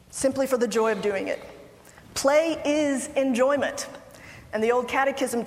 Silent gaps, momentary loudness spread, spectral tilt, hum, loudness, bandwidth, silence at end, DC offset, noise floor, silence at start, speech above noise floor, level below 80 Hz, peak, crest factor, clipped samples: none; 13 LU; -3.5 dB/octave; none; -25 LUFS; 16 kHz; 0 s; under 0.1%; -49 dBFS; 0.1 s; 25 dB; -58 dBFS; -8 dBFS; 18 dB; under 0.1%